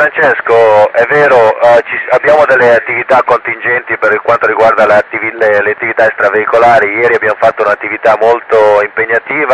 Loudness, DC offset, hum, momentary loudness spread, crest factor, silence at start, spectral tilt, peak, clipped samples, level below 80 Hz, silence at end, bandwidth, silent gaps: -8 LUFS; under 0.1%; none; 5 LU; 8 dB; 0 s; -5.5 dB/octave; 0 dBFS; 0.8%; -50 dBFS; 0 s; 9.8 kHz; none